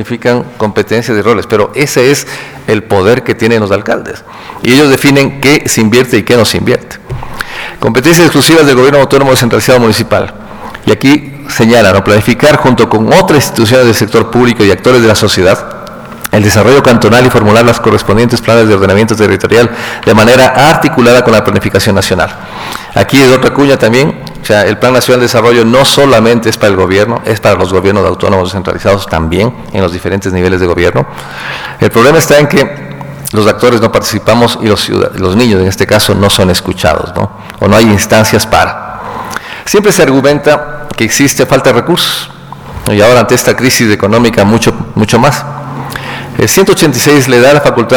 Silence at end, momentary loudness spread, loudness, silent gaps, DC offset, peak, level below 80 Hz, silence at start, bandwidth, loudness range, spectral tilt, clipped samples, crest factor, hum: 0 s; 14 LU; -7 LUFS; none; under 0.1%; 0 dBFS; -32 dBFS; 0 s; over 20 kHz; 3 LU; -5 dB/octave; under 0.1%; 8 dB; none